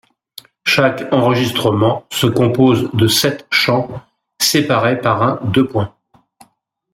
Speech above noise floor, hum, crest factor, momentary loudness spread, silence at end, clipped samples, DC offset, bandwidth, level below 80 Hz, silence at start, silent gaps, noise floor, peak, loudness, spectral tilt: 45 dB; none; 16 dB; 6 LU; 1.05 s; under 0.1%; under 0.1%; 16.5 kHz; -52 dBFS; 0.65 s; none; -60 dBFS; 0 dBFS; -15 LUFS; -4.5 dB/octave